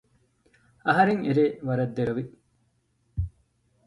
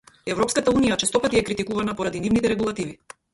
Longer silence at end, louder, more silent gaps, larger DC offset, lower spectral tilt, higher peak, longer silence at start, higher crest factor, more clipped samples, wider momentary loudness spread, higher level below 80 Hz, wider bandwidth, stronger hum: first, 0.6 s vs 0.4 s; second, -26 LUFS vs -22 LUFS; neither; neither; first, -8.5 dB/octave vs -4 dB/octave; about the same, -8 dBFS vs -6 dBFS; first, 0.85 s vs 0.25 s; about the same, 20 dB vs 16 dB; neither; first, 15 LU vs 8 LU; about the same, -46 dBFS vs -48 dBFS; about the same, 11 kHz vs 11.5 kHz; neither